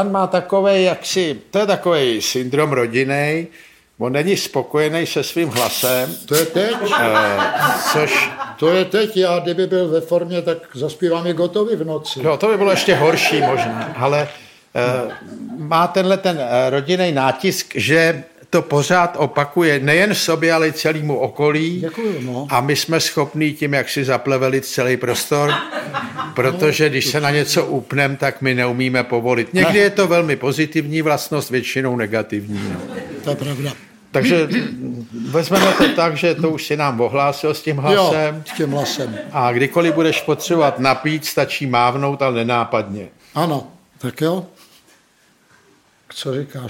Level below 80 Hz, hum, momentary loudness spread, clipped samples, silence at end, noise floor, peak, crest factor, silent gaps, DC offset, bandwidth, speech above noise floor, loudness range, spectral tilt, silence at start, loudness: -58 dBFS; none; 10 LU; under 0.1%; 0 s; -56 dBFS; 0 dBFS; 18 dB; none; under 0.1%; 17 kHz; 38 dB; 4 LU; -4.5 dB/octave; 0 s; -17 LUFS